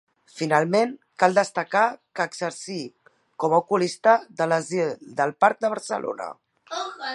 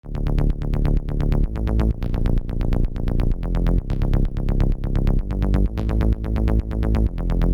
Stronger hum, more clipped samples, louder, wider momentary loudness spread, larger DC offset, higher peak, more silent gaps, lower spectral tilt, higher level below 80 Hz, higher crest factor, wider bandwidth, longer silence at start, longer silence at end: neither; neither; about the same, -23 LUFS vs -23 LUFS; first, 12 LU vs 3 LU; neither; first, -2 dBFS vs -8 dBFS; neither; second, -4.5 dB/octave vs -9.5 dB/octave; second, -78 dBFS vs -20 dBFS; first, 22 dB vs 12 dB; first, 11.5 kHz vs 5.4 kHz; first, 0.35 s vs 0.05 s; about the same, 0 s vs 0 s